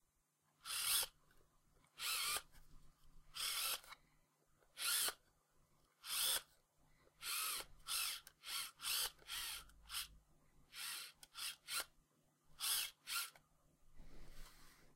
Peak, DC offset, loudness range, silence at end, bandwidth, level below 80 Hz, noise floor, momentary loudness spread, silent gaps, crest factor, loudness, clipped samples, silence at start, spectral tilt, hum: -24 dBFS; under 0.1%; 3 LU; 0.05 s; 16 kHz; -68 dBFS; -82 dBFS; 19 LU; none; 22 dB; -42 LUFS; under 0.1%; 0.65 s; 2 dB/octave; none